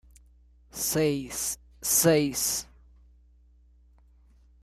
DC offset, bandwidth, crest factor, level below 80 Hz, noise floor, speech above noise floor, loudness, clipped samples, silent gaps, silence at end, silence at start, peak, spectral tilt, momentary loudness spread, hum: under 0.1%; 15.5 kHz; 20 dB; -54 dBFS; -58 dBFS; 32 dB; -26 LUFS; under 0.1%; none; 2 s; 0.75 s; -10 dBFS; -3.5 dB/octave; 12 LU; 60 Hz at -55 dBFS